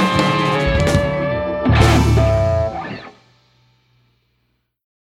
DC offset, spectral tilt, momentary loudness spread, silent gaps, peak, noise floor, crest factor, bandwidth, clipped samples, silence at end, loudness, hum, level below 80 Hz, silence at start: under 0.1%; -6 dB/octave; 11 LU; none; 0 dBFS; -67 dBFS; 18 dB; 15 kHz; under 0.1%; 2 s; -16 LUFS; none; -26 dBFS; 0 s